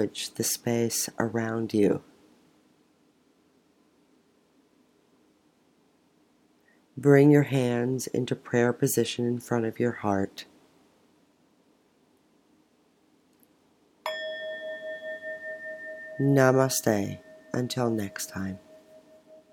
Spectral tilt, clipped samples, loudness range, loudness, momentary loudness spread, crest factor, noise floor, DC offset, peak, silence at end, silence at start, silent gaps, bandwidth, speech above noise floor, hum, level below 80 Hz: -5 dB/octave; under 0.1%; 14 LU; -27 LUFS; 16 LU; 24 dB; -65 dBFS; under 0.1%; -6 dBFS; 0.2 s; 0 s; none; 17.5 kHz; 40 dB; none; -76 dBFS